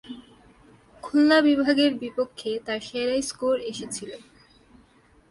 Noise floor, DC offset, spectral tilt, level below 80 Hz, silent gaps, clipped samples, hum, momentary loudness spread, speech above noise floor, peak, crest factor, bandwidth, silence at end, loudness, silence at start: -58 dBFS; under 0.1%; -3.5 dB/octave; -62 dBFS; none; under 0.1%; none; 23 LU; 34 dB; -8 dBFS; 18 dB; 11.5 kHz; 1.1 s; -24 LUFS; 0.05 s